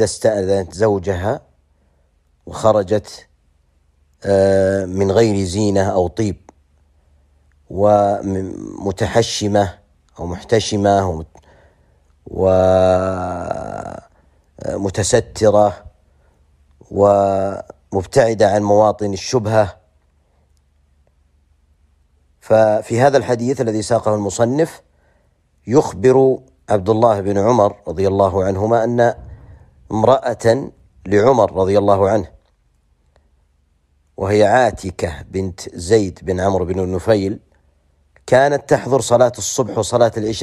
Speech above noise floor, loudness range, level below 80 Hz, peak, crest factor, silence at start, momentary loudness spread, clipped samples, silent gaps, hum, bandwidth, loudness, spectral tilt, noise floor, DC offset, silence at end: 44 dB; 4 LU; -46 dBFS; 0 dBFS; 16 dB; 0 s; 12 LU; under 0.1%; none; none; 13 kHz; -16 LUFS; -5.5 dB/octave; -59 dBFS; under 0.1%; 0 s